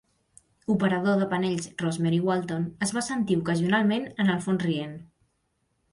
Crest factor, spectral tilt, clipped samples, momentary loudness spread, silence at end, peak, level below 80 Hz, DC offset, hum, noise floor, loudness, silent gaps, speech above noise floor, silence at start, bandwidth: 16 dB; -6 dB/octave; under 0.1%; 7 LU; 0.85 s; -10 dBFS; -62 dBFS; under 0.1%; none; -74 dBFS; -26 LUFS; none; 48 dB; 0.7 s; 11.5 kHz